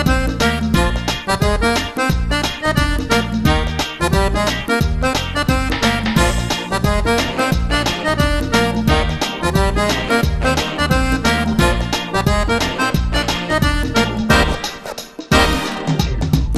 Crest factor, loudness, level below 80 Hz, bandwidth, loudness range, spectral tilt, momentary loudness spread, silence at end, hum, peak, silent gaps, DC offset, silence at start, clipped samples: 16 dB; -17 LUFS; -22 dBFS; 14 kHz; 1 LU; -4.5 dB/octave; 4 LU; 0 s; none; 0 dBFS; none; under 0.1%; 0 s; under 0.1%